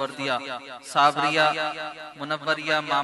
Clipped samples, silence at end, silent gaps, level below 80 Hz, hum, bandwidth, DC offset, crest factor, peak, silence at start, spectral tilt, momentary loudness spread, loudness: under 0.1%; 0 s; none; -72 dBFS; none; 12 kHz; under 0.1%; 20 dB; -6 dBFS; 0 s; -3.5 dB/octave; 15 LU; -24 LUFS